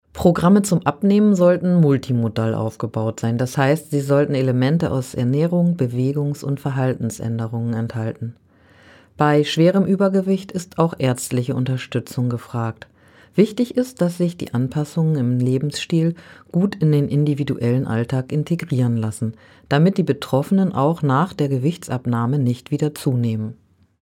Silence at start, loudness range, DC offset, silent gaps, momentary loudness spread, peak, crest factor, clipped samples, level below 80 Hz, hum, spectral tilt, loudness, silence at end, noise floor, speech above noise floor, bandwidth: 0.15 s; 4 LU; under 0.1%; none; 9 LU; -2 dBFS; 18 dB; under 0.1%; -54 dBFS; none; -7 dB/octave; -20 LUFS; 0.5 s; -50 dBFS; 31 dB; 16 kHz